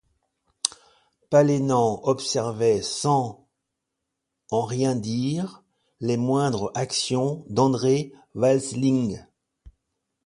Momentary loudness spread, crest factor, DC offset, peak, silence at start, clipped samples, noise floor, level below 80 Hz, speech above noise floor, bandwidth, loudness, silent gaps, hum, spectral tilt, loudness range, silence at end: 8 LU; 24 dB; under 0.1%; 0 dBFS; 0.65 s; under 0.1%; -82 dBFS; -60 dBFS; 59 dB; 11.5 kHz; -24 LUFS; none; none; -5.5 dB/octave; 4 LU; 0.55 s